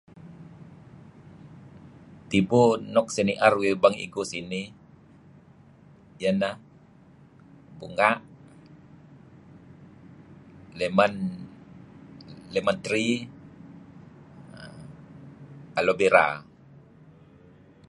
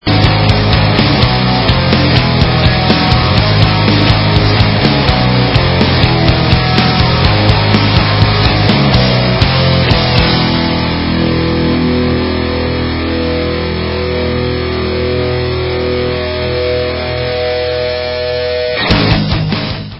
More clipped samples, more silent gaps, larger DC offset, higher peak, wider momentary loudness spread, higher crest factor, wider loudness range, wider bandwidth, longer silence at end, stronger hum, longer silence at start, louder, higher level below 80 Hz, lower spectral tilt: second, under 0.1% vs 0.2%; neither; neither; second, -4 dBFS vs 0 dBFS; first, 27 LU vs 6 LU; first, 26 dB vs 10 dB; first, 8 LU vs 5 LU; first, 11.5 kHz vs 8 kHz; first, 1.45 s vs 0 s; neither; first, 0.2 s vs 0.05 s; second, -24 LUFS vs -11 LUFS; second, -62 dBFS vs -22 dBFS; second, -5 dB/octave vs -7.5 dB/octave